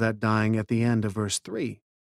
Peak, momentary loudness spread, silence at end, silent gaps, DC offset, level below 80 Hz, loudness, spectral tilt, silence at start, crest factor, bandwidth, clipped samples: -10 dBFS; 8 LU; 0.4 s; none; under 0.1%; -60 dBFS; -26 LUFS; -5.5 dB/octave; 0 s; 16 dB; 13 kHz; under 0.1%